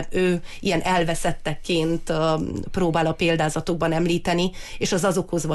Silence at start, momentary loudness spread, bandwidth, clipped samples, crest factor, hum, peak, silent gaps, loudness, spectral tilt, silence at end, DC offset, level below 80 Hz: 0 s; 5 LU; 12.5 kHz; under 0.1%; 12 dB; none; -10 dBFS; none; -23 LUFS; -5 dB/octave; 0 s; under 0.1%; -42 dBFS